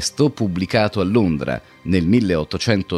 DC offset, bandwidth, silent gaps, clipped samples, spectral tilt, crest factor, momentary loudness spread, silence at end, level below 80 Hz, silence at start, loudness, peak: under 0.1%; 13 kHz; none; under 0.1%; -5.5 dB/octave; 16 dB; 6 LU; 0 s; -42 dBFS; 0 s; -19 LUFS; -4 dBFS